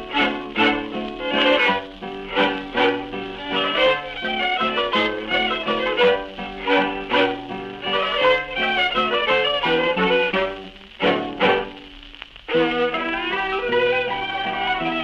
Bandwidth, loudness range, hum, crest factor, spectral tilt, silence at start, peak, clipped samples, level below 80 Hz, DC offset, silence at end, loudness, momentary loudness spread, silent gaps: 7.6 kHz; 3 LU; none; 16 dB; -5 dB/octave; 0 s; -4 dBFS; under 0.1%; -48 dBFS; under 0.1%; 0 s; -20 LUFS; 11 LU; none